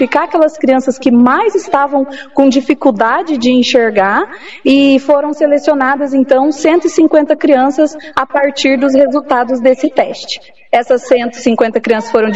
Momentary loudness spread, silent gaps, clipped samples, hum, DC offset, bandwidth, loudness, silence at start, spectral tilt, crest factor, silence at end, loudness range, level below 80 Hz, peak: 6 LU; none; 0.5%; none; 0.8%; 8 kHz; -11 LUFS; 0 s; -4.5 dB/octave; 10 dB; 0 s; 2 LU; -54 dBFS; 0 dBFS